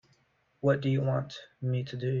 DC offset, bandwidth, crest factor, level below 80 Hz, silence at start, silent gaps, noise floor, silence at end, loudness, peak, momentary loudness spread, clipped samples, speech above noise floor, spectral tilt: under 0.1%; 7.2 kHz; 18 dB; -66 dBFS; 0.65 s; none; -70 dBFS; 0 s; -31 LUFS; -14 dBFS; 8 LU; under 0.1%; 41 dB; -8 dB/octave